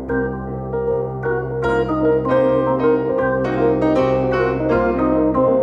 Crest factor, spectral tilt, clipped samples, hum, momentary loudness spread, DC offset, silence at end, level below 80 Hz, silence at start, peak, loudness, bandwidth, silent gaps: 12 dB; -9 dB/octave; under 0.1%; none; 6 LU; under 0.1%; 0 s; -36 dBFS; 0 s; -4 dBFS; -18 LUFS; 7.4 kHz; none